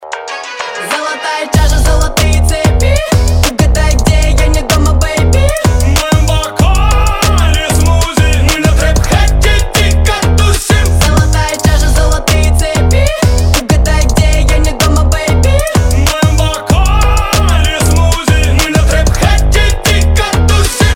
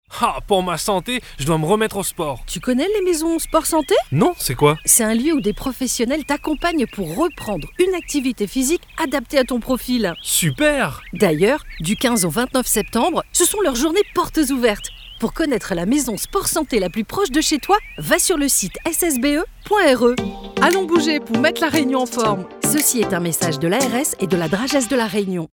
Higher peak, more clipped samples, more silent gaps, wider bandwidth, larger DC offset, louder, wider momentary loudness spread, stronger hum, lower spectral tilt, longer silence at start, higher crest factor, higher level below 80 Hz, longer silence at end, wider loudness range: about the same, 0 dBFS vs -2 dBFS; first, 0.1% vs under 0.1%; neither; second, 17 kHz vs over 20 kHz; neither; first, -10 LUFS vs -18 LUFS; second, 2 LU vs 7 LU; neither; about the same, -4.5 dB/octave vs -3.5 dB/octave; about the same, 0 s vs 0.1 s; second, 8 dB vs 18 dB; first, -12 dBFS vs -40 dBFS; about the same, 0 s vs 0.1 s; second, 0 LU vs 3 LU